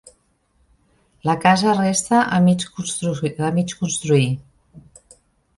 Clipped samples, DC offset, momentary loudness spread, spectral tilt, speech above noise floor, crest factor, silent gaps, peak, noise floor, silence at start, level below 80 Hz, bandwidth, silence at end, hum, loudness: under 0.1%; under 0.1%; 8 LU; -5 dB/octave; 44 dB; 18 dB; none; -2 dBFS; -63 dBFS; 1.25 s; -54 dBFS; 11.5 kHz; 0.8 s; none; -19 LUFS